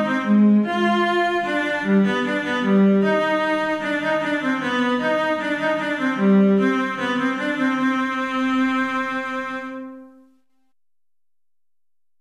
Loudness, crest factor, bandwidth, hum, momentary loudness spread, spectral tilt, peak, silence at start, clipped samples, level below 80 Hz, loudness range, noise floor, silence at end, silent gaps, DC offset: -20 LUFS; 14 dB; 11 kHz; none; 6 LU; -6.5 dB/octave; -8 dBFS; 0 s; under 0.1%; -62 dBFS; 7 LU; under -90 dBFS; 2.1 s; none; under 0.1%